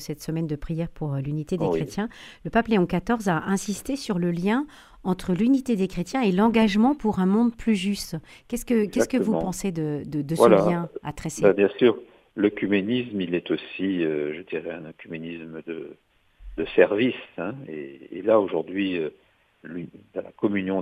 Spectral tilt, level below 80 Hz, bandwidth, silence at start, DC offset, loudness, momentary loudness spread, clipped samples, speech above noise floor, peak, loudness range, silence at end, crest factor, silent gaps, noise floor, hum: -6 dB/octave; -50 dBFS; 15 kHz; 0 s; under 0.1%; -24 LUFS; 16 LU; under 0.1%; 21 dB; -2 dBFS; 5 LU; 0 s; 22 dB; none; -45 dBFS; none